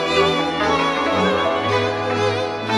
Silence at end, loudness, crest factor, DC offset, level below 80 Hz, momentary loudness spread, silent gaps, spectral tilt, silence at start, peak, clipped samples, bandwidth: 0 s; -19 LUFS; 14 dB; under 0.1%; -48 dBFS; 3 LU; none; -4.5 dB/octave; 0 s; -4 dBFS; under 0.1%; 12.5 kHz